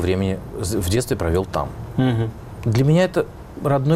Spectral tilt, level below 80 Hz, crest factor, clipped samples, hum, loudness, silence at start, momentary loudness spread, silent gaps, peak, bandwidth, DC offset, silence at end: -6.5 dB/octave; -38 dBFS; 12 dB; under 0.1%; none; -21 LUFS; 0 s; 10 LU; none; -8 dBFS; 16 kHz; under 0.1%; 0 s